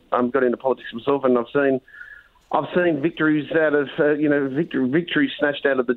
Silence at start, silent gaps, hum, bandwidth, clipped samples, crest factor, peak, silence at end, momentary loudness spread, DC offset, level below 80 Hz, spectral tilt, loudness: 0.1 s; none; none; 4.2 kHz; under 0.1%; 16 dB; -4 dBFS; 0 s; 6 LU; under 0.1%; -62 dBFS; -9 dB/octave; -21 LUFS